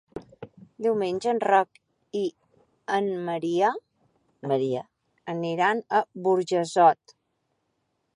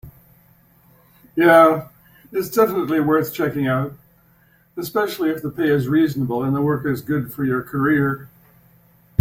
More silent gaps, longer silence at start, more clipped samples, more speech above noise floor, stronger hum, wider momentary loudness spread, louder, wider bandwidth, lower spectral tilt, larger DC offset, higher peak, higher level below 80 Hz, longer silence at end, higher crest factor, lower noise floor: neither; about the same, 0.15 s vs 0.05 s; neither; first, 51 dB vs 38 dB; neither; first, 20 LU vs 12 LU; second, -25 LUFS vs -19 LUFS; second, 11 kHz vs 16.5 kHz; second, -5.5 dB/octave vs -7 dB/octave; neither; second, -6 dBFS vs -2 dBFS; second, -72 dBFS vs -56 dBFS; first, 1.2 s vs 0.95 s; about the same, 20 dB vs 18 dB; first, -76 dBFS vs -56 dBFS